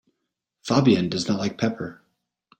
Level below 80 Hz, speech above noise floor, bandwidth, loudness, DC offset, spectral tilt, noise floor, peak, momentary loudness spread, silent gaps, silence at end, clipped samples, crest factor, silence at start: -60 dBFS; 58 dB; 9.2 kHz; -22 LUFS; under 0.1%; -6 dB/octave; -80 dBFS; -6 dBFS; 17 LU; none; 0.65 s; under 0.1%; 20 dB; 0.65 s